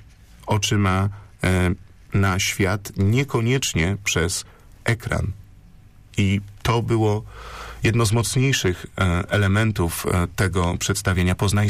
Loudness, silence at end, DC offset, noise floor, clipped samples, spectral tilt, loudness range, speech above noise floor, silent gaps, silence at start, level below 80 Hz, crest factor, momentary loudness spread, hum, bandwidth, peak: -22 LUFS; 0 s; under 0.1%; -47 dBFS; under 0.1%; -5 dB/octave; 3 LU; 26 dB; none; 0 s; -40 dBFS; 12 dB; 8 LU; none; 15.5 kHz; -10 dBFS